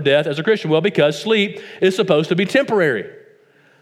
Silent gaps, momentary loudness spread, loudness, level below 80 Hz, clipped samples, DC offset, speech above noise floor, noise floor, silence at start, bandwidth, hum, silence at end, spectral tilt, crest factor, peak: none; 4 LU; -17 LUFS; -70 dBFS; under 0.1%; under 0.1%; 36 dB; -53 dBFS; 0 s; 13.5 kHz; none; 0.7 s; -5.5 dB/octave; 16 dB; -2 dBFS